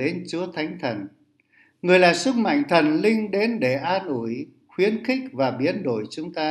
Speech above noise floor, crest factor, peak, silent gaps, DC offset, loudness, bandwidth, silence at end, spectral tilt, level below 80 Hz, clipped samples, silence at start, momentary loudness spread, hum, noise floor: 38 dB; 20 dB; -2 dBFS; none; under 0.1%; -22 LUFS; 12 kHz; 0 s; -5.5 dB/octave; -72 dBFS; under 0.1%; 0 s; 12 LU; none; -60 dBFS